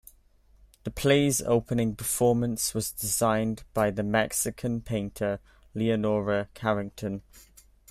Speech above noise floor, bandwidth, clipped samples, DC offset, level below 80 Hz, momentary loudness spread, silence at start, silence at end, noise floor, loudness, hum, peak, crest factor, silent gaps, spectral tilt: 33 dB; 16 kHz; under 0.1%; under 0.1%; -52 dBFS; 11 LU; 0.85 s; 0.5 s; -60 dBFS; -27 LUFS; none; -8 dBFS; 20 dB; none; -4.5 dB/octave